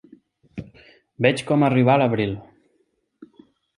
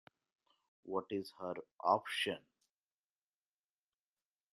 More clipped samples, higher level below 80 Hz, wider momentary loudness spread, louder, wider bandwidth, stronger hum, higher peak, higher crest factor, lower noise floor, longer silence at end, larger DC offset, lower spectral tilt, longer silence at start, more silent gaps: neither; first, -56 dBFS vs -86 dBFS; first, 22 LU vs 11 LU; first, -20 LUFS vs -39 LUFS; second, 11.5 kHz vs 13 kHz; neither; first, -2 dBFS vs -18 dBFS; about the same, 22 dB vs 26 dB; second, -68 dBFS vs under -90 dBFS; second, 1.35 s vs 2.15 s; neither; first, -7 dB/octave vs -4 dB/octave; second, 0.55 s vs 0.85 s; second, none vs 1.73-1.78 s